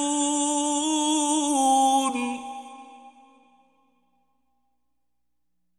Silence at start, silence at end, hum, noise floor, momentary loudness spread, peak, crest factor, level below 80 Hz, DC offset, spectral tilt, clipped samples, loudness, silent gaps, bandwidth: 0 s; 2.7 s; 60 Hz at -85 dBFS; -83 dBFS; 16 LU; -10 dBFS; 16 dB; -70 dBFS; under 0.1%; -0.5 dB/octave; under 0.1%; -23 LUFS; none; 14 kHz